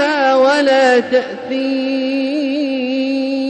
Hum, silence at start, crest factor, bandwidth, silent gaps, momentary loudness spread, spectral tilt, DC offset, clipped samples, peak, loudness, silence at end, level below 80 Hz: none; 0 s; 12 dB; 9.2 kHz; none; 7 LU; -3.5 dB/octave; under 0.1%; under 0.1%; -2 dBFS; -15 LUFS; 0 s; -64 dBFS